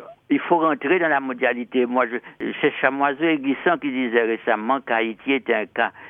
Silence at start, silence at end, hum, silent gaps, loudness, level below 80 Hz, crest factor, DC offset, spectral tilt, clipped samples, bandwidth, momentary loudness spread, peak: 0 s; 0 s; none; none; -21 LUFS; -72 dBFS; 20 dB; under 0.1%; -8 dB/octave; under 0.1%; 3.8 kHz; 4 LU; -2 dBFS